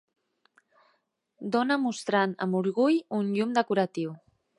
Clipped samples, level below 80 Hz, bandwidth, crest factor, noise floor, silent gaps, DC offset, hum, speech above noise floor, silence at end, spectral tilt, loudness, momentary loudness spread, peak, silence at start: under 0.1%; -80 dBFS; 11.5 kHz; 18 dB; -73 dBFS; none; under 0.1%; none; 46 dB; 0.4 s; -6 dB/octave; -27 LUFS; 6 LU; -10 dBFS; 1.4 s